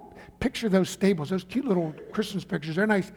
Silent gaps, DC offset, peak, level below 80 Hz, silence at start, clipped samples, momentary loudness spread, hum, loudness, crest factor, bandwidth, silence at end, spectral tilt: none; under 0.1%; -10 dBFS; -54 dBFS; 0 s; under 0.1%; 7 LU; none; -27 LUFS; 18 dB; 17.5 kHz; 0 s; -6 dB/octave